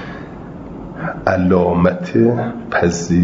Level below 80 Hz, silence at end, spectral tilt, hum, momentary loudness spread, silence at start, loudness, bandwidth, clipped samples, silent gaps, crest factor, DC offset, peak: -42 dBFS; 0 s; -7 dB/octave; none; 18 LU; 0 s; -16 LUFS; 7.8 kHz; under 0.1%; none; 16 dB; under 0.1%; 0 dBFS